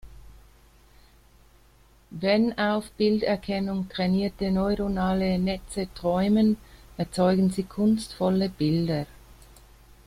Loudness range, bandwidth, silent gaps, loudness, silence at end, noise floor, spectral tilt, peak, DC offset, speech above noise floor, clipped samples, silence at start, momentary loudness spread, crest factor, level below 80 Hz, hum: 3 LU; 14 kHz; none; -25 LUFS; 1 s; -57 dBFS; -7 dB/octave; -10 dBFS; under 0.1%; 32 dB; under 0.1%; 0.05 s; 9 LU; 16 dB; -48 dBFS; none